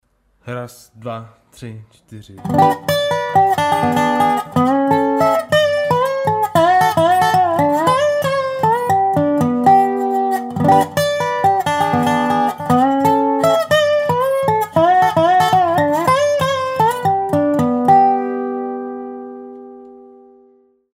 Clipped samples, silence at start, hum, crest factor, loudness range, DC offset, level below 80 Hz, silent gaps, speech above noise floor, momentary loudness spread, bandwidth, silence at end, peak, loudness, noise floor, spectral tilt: under 0.1%; 0.45 s; none; 14 dB; 4 LU; under 0.1%; -54 dBFS; none; 32 dB; 16 LU; 16 kHz; 1 s; -2 dBFS; -15 LUFS; -53 dBFS; -5.5 dB/octave